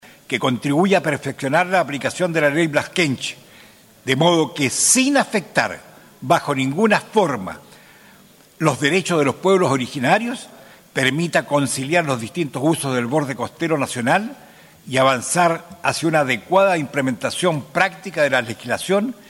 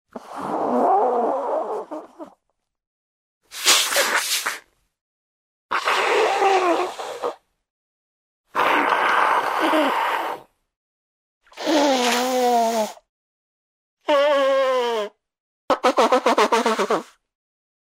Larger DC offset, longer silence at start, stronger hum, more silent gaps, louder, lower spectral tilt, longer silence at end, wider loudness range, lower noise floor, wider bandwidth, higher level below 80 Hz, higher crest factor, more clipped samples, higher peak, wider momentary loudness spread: neither; first, 0.3 s vs 0.15 s; neither; second, none vs 2.87-3.41 s, 5.01-5.69 s, 7.70-8.44 s, 10.76-11.41 s, 13.09-13.97 s, 15.40-15.68 s; about the same, -19 LUFS vs -20 LUFS; first, -4 dB/octave vs -1 dB/octave; second, 0.15 s vs 0.9 s; about the same, 3 LU vs 3 LU; second, -49 dBFS vs -76 dBFS; about the same, 17 kHz vs 16 kHz; first, -62 dBFS vs -70 dBFS; about the same, 18 dB vs 22 dB; neither; about the same, -2 dBFS vs 0 dBFS; second, 9 LU vs 13 LU